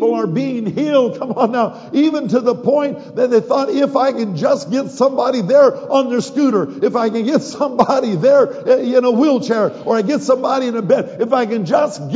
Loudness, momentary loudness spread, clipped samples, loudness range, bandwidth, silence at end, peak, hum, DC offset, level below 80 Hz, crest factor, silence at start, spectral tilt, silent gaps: -16 LUFS; 6 LU; under 0.1%; 2 LU; 7.8 kHz; 0 s; 0 dBFS; none; under 0.1%; -66 dBFS; 14 dB; 0 s; -6.5 dB/octave; none